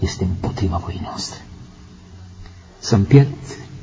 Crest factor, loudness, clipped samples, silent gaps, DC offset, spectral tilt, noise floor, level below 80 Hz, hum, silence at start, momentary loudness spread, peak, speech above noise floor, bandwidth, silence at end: 20 dB; -19 LUFS; under 0.1%; none; under 0.1%; -6.5 dB/octave; -41 dBFS; -34 dBFS; none; 0 s; 27 LU; 0 dBFS; 24 dB; 8 kHz; 0 s